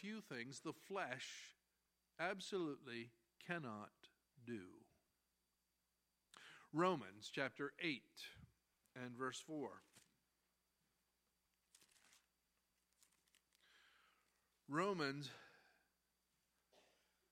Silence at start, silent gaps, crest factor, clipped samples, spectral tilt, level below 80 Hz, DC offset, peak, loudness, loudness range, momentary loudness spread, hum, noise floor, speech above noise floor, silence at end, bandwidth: 0 s; none; 26 dB; under 0.1%; -4.5 dB/octave; under -90 dBFS; under 0.1%; -24 dBFS; -48 LUFS; 9 LU; 21 LU; none; -88 dBFS; 41 dB; 1.8 s; 16 kHz